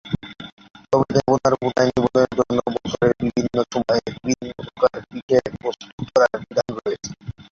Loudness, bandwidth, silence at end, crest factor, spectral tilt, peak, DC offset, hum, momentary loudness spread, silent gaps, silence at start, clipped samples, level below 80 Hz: -21 LUFS; 7.4 kHz; 0.15 s; 18 dB; -5.5 dB/octave; -2 dBFS; under 0.1%; none; 15 LU; 0.52-0.57 s, 5.22-5.29 s, 5.92-5.98 s; 0.05 s; under 0.1%; -50 dBFS